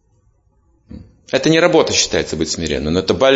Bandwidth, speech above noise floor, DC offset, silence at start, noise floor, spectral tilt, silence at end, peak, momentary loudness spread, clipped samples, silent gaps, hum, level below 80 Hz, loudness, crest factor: 8 kHz; 43 dB; under 0.1%; 0.9 s; -57 dBFS; -3.5 dB/octave; 0 s; 0 dBFS; 8 LU; under 0.1%; none; none; -40 dBFS; -15 LUFS; 16 dB